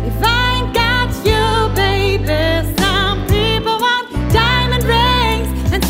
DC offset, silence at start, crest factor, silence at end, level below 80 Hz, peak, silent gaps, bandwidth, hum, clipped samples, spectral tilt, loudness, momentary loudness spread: under 0.1%; 0 s; 14 dB; 0 s; -22 dBFS; 0 dBFS; none; 16.5 kHz; none; under 0.1%; -5 dB/octave; -14 LUFS; 3 LU